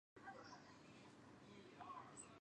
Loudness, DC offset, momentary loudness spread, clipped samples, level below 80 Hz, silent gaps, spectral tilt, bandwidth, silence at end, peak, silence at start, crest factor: -60 LUFS; under 0.1%; 7 LU; under 0.1%; -86 dBFS; none; -3.5 dB/octave; 10 kHz; 0 s; -44 dBFS; 0.15 s; 16 dB